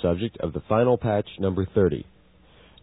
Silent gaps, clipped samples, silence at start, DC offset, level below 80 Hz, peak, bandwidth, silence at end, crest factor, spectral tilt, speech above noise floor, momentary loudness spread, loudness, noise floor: none; under 0.1%; 0 s; under 0.1%; -48 dBFS; -8 dBFS; 4 kHz; 0.8 s; 16 dB; -12 dB/octave; 31 dB; 8 LU; -24 LUFS; -55 dBFS